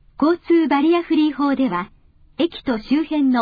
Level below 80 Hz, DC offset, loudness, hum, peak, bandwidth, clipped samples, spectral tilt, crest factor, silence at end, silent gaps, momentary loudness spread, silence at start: -52 dBFS; under 0.1%; -19 LUFS; none; -6 dBFS; 5 kHz; under 0.1%; -7.5 dB/octave; 12 dB; 0 s; none; 8 LU; 0.2 s